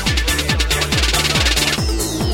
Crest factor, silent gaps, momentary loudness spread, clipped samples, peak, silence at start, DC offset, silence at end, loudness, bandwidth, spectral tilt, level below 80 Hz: 14 dB; none; 4 LU; under 0.1%; -2 dBFS; 0 s; under 0.1%; 0 s; -16 LUFS; 16.5 kHz; -3 dB/octave; -22 dBFS